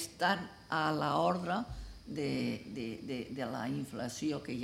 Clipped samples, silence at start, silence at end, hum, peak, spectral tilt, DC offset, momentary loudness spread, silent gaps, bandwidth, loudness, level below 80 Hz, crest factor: under 0.1%; 0 s; 0 s; none; -16 dBFS; -5 dB/octave; under 0.1%; 10 LU; none; 16 kHz; -36 LUFS; -56 dBFS; 20 dB